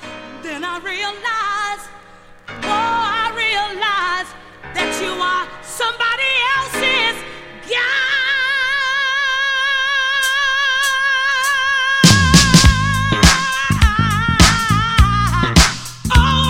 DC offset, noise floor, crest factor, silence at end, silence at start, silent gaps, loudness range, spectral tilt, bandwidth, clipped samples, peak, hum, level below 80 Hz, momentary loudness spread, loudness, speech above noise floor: under 0.1%; -42 dBFS; 16 dB; 0 s; 0 s; none; 8 LU; -3 dB/octave; 16.5 kHz; under 0.1%; 0 dBFS; none; -24 dBFS; 13 LU; -15 LUFS; 20 dB